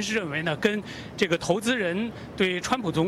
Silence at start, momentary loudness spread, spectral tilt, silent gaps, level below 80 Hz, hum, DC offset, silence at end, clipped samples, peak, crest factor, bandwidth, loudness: 0 s; 7 LU; -4.5 dB/octave; none; -54 dBFS; none; under 0.1%; 0 s; under 0.1%; -8 dBFS; 18 dB; 15 kHz; -26 LUFS